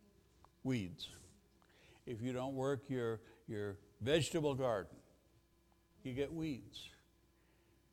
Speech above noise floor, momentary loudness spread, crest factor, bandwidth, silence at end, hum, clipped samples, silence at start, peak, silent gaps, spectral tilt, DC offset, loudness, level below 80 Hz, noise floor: 33 dB; 16 LU; 22 dB; 16.5 kHz; 1 s; none; under 0.1%; 0.65 s; -22 dBFS; none; -5.5 dB/octave; under 0.1%; -41 LUFS; -68 dBFS; -73 dBFS